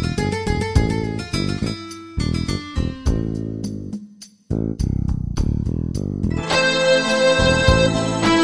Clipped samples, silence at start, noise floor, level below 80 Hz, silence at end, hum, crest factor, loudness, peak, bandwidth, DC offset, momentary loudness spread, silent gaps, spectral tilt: under 0.1%; 0 s; -42 dBFS; -28 dBFS; 0 s; none; 18 dB; -20 LUFS; 0 dBFS; 11 kHz; under 0.1%; 12 LU; none; -5 dB/octave